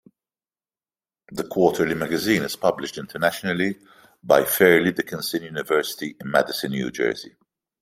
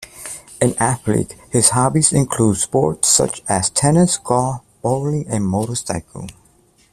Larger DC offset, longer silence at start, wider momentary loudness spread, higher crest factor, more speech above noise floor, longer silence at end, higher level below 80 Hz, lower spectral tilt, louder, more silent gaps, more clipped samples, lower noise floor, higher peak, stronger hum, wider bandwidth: neither; first, 1.3 s vs 0 s; about the same, 15 LU vs 13 LU; about the same, 22 dB vs 18 dB; first, over 68 dB vs 37 dB; about the same, 0.5 s vs 0.6 s; second, -62 dBFS vs -46 dBFS; about the same, -4.5 dB/octave vs -4.5 dB/octave; second, -22 LUFS vs -17 LUFS; neither; neither; first, under -90 dBFS vs -54 dBFS; about the same, -2 dBFS vs 0 dBFS; neither; first, 16 kHz vs 14.5 kHz